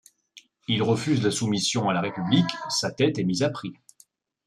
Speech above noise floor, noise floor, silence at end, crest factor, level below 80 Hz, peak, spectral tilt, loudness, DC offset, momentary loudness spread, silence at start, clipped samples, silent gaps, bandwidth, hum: 36 dB; -60 dBFS; 0.75 s; 20 dB; -64 dBFS; -6 dBFS; -5 dB/octave; -24 LUFS; under 0.1%; 5 LU; 0.35 s; under 0.1%; none; 13 kHz; none